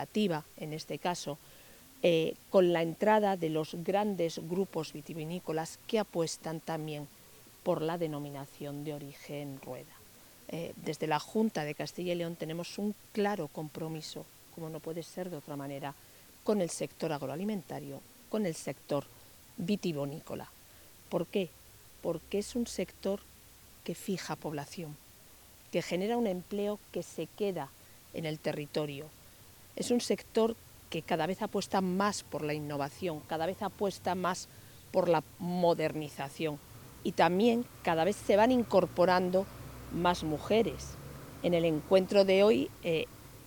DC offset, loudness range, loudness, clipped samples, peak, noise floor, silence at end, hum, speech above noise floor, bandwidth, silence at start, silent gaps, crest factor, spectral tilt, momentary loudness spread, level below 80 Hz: under 0.1%; 9 LU; -33 LUFS; under 0.1%; -12 dBFS; -56 dBFS; 0 s; none; 24 dB; 19.5 kHz; 0 s; none; 22 dB; -5.5 dB/octave; 16 LU; -62 dBFS